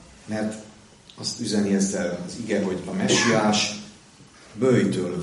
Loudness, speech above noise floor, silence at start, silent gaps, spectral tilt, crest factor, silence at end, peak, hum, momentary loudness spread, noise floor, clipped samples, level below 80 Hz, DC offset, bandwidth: -23 LUFS; 27 dB; 0.25 s; none; -4 dB/octave; 16 dB; 0 s; -8 dBFS; none; 13 LU; -50 dBFS; under 0.1%; -58 dBFS; under 0.1%; 11.5 kHz